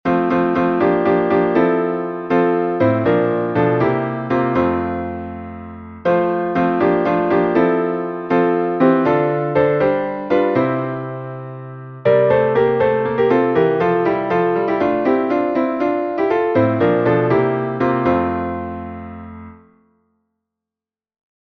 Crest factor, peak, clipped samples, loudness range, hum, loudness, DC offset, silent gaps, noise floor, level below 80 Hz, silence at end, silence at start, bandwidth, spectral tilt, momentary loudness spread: 16 dB; -2 dBFS; under 0.1%; 3 LU; none; -17 LUFS; under 0.1%; none; -90 dBFS; -50 dBFS; 1.95 s; 0.05 s; 6.2 kHz; -9.5 dB/octave; 13 LU